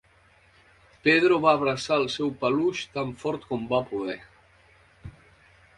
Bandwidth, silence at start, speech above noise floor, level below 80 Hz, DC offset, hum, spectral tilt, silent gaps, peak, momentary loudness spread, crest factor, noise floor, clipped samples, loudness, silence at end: 11.5 kHz; 1.05 s; 35 dB; -60 dBFS; under 0.1%; none; -5 dB/octave; none; -6 dBFS; 12 LU; 22 dB; -59 dBFS; under 0.1%; -25 LUFS; 0.7 s